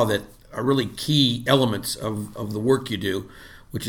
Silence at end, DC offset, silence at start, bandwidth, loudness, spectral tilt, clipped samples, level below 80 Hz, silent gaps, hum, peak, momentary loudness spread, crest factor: 0 s; under 0.1%; 0 s; 18.5 kHz; -23 LUFS; -5 dB/octave; under 0.1%; -50 dBFS; none; none; -4 dBFS; 12 LU; 18 dB